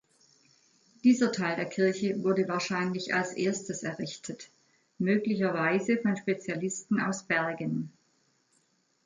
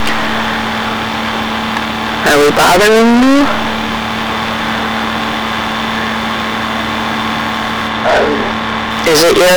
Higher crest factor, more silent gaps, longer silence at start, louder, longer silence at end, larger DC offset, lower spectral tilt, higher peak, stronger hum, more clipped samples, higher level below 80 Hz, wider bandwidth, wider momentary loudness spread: first, 18 dB vs 6 dB; neither; first, 1.05 s vs 0 s; second, -29 LUFS vs -12 LUFS; first, 1.15 s vs 0 s; neither; first, -5 dB/octave vs -3.5 dB/octave; second, -12 dBFS vs -6 dBFS; neither; neither; second, -74 dBFS vs -36 dBFS; second, 9.6 kHz vs over 20 kHz; about the same, 9 LU vs 8 LU